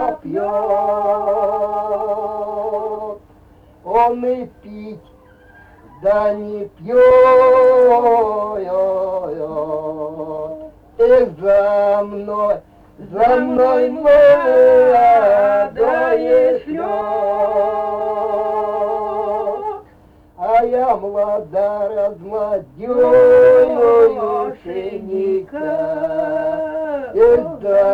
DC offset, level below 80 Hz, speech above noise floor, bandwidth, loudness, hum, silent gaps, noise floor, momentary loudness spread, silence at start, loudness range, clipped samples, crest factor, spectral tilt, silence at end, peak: under 0.1%; -48 dBFS; 33 dB; 5 kHz; -15 LUFS; none; none; -47 dBFS; 15 LU; 0 s; 9 LU; under 0.1%; 12 dB; -7 dB/octave; 0 s; -2 dBFS